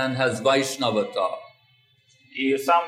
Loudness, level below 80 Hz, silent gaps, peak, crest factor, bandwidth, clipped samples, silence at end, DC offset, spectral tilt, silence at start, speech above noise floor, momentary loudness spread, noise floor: -23 LUFS; -76 dBFS; none; -6 dBFS; 18 dB; 16 kHz; under 0.1%; 0 s; under 0.1%; -4 dB/octave; 0 s; 39 dB; 10 LU; -61 dBFS